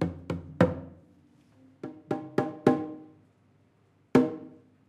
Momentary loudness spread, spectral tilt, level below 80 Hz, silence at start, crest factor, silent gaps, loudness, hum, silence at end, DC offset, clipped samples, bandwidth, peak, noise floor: 20 LU; -8 dB/octave; -60 dBFS; 0 s; 26 dB; none; -29 LUFS; none; 0.4 s; under 0.1%; under 0.1%; 11 kHz; -6 dBFS; -65 dBFS